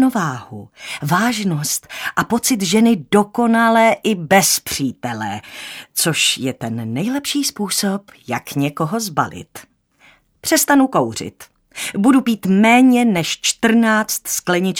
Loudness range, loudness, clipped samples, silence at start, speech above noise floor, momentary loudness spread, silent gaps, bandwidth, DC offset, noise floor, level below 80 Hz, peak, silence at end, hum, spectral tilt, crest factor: 6 LU; -16 LUFS; under 0.1%; 0 s; 35 dB; 14 LU; none; 18 kHz; under 0.1%; -52 dBFS; -56 dBFS; 0 dBFS; 0 s; none; -3.5 dB/octave; 18 dB